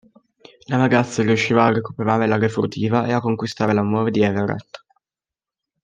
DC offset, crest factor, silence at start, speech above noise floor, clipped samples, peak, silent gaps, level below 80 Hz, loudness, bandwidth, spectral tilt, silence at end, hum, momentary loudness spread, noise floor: under 0.1%; 18 dB; 0.7 s; over 71 dB; under 0.1%; -2 dBFS; none; -60 dBFS; -19 LUFS; 9.4 kHz; -6.5 dB/octave; 1.05 s; none; 7 LU; under -90 dBFS